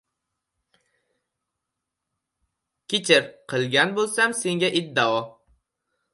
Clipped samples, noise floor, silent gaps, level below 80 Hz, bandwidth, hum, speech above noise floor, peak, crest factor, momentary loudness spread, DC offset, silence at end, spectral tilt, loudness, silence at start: under 0.1%; -83 dBFS; none; -72 dBFS; 11.5 kHz; none; 61 dB; -2 dBFS; 24 dB; 9 LU; under 0.1%; 0.85 s; -3 dB/octave; -22 LUFS; 2.9 s